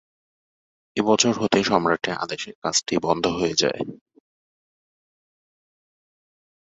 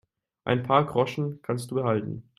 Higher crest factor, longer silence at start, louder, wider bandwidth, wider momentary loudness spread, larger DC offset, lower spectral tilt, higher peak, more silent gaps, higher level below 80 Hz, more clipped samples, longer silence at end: about the same, 24 dB vs 20 dB; first, 0.95 s vs 0.45 s; first, -22 LUFS vs -26 LUFS; second, 8.2 kHz vs 14 kHz; about the same, 10 LU vs 9 LU; neither; second, -3 dB/octave vs -7 dB/octave; first, -2 dBFS vs -6 dBFS; first, 2.55-2.62 s vs none; about the same, -58 dBFS vs -62 dBFS; neither; first, 2.8 s vs 0.15 s